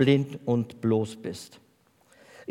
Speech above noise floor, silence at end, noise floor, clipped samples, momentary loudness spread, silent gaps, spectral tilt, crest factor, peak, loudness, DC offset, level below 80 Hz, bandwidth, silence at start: 37 dB; 1.05 s; -63 dBFS; under 0.1%; 18 LU; none; -7 dB/octave; 18 dB; -8 dBFS; -28 LUFS; under 0.1%; -72 dBFS; 14.5 kHz; 0 s